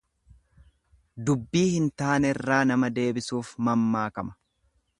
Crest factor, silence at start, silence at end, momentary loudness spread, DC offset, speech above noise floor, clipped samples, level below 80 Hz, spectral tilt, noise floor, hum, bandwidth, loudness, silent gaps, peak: 20 dB; 1.15 s; 0.65 s; 9 LU; under 0.1%; 45 dB; under 0.1%; -58 dBFS; -6 dB/octave; -70 dBFS; none; 11.5 kHz; -26 LUFS; none; -8 dBFS